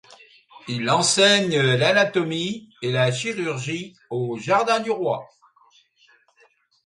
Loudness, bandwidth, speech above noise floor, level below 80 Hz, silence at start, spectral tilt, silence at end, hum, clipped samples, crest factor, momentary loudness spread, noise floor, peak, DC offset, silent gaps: -21 LUFS; 11.5 kHz; 39 dB; -66 dBFS; 0.55 s; -3.5 dB/octave; 1.6 s; none; under 0.1%; 20 dB; 14 LU; -60 dBFS; -4 dBFS; under 0.1%; none